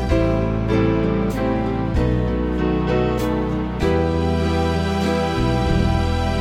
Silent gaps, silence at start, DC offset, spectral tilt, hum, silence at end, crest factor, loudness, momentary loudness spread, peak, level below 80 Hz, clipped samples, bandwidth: none; 0 s; under 0.1%; -7.5 dB/octave; none; 0 s; 14 dB; -20 LUFS; 3 LU; -6 dBFS; -26 dBFS; under 0.1%; 16 kHz